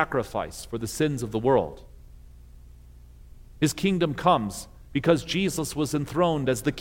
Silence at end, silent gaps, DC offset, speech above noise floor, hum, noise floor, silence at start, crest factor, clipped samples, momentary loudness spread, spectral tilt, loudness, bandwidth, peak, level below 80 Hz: 0 s; none; under 0.1%; 23 dB; 60 Hz at -50 dBFS; -48 dBFS; 0 s; 20 dB; under 0.1%; 10 LU; -5.5 dB/octave; -26 LUFS; 17 kHz; -6 dBFS; -48 dBFS